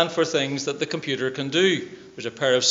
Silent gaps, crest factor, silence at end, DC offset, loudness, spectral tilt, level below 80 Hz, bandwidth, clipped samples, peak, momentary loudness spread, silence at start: none; 20 dB; 0 s; under 0.1%; -23 LUFS; -3 dB/octave; -68 dBFS; 8 kHz; under 0.1%; -4 dBFS; 12 LU; 0 s